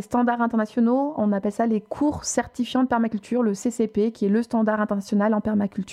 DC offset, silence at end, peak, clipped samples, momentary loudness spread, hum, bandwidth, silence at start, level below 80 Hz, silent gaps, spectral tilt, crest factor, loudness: under 0.1%; 0 s; -8 dBFS; under 0.1%; 4 LU; none; 12 kHz; 0 s; -56 dBFS; none; -6 dB/octave; 14 dB; -23 LUFS